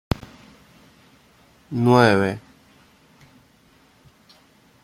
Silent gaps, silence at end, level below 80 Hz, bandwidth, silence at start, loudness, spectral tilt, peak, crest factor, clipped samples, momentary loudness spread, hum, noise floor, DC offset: none; 2.45 s; -48 dBFS; 14 kHz; 1.7 s; -19 LUFS; -7 dB/octave; -2 dBFS; 22 dB; under 0.1%; 16 LU; none; -56 dBFS; under 0.1%